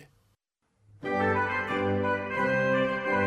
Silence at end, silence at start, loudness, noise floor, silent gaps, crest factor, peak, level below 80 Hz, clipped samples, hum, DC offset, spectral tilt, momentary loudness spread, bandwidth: 0 s; 0 s; -27 LUFS; -74 dBFS; none; 16 dB; -14 dBFS; -62 dBFS; under 0.1%; none; under 0.1%; -7 dB/octave; 4 LU; 10 kHz